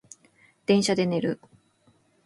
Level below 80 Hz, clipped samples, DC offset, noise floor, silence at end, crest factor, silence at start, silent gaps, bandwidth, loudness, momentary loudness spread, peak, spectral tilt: -70 dBFS; under 0.1%; under 0.1%; -64 dBFS; 0.9 s; 20 dB; 0.7 s; none; 11.5 kHz; -25 LUFS; 13 LU; -8 dBFS; -5 dB/octave